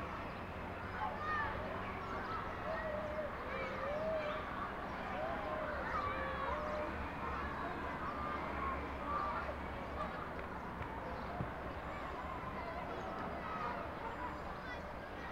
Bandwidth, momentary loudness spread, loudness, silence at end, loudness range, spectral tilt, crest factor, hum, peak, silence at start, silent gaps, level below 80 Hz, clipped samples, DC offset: 16 kHz; 6 LU; -42 LUFS; 0 s; 3 LU; -6.5 dB/octave; 16 dB; none; -26 dBFS; 0 s; none; -52 dBFS; under 0.1%; under 0.1%